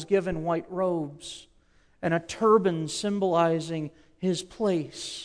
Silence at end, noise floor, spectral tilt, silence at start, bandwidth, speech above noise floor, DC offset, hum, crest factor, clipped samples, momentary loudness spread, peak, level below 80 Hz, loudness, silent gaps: 0 s; -61 dBFS; -5.5 dB/octave; 0 s; 11 kHz; 35 dB; under 0.1%; none; 18 dB; under 0.1%; 13 LU; -10 dBFS; -56 dBFS; -27 LUFS; none